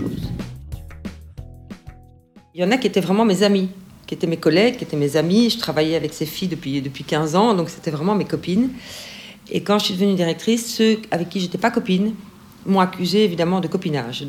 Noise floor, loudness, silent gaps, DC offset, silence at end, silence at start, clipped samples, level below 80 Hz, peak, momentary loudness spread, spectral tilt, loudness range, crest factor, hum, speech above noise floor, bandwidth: -49 dBFS; -20 LUFS; none; under 0.1%; 0 s; 0 s; under 0.1%; -46 dBFS; -2 dBFS; 19 LU; -5.5 dB/octave; 3 LU; 18 dB; none; 30 dB; 16 kHz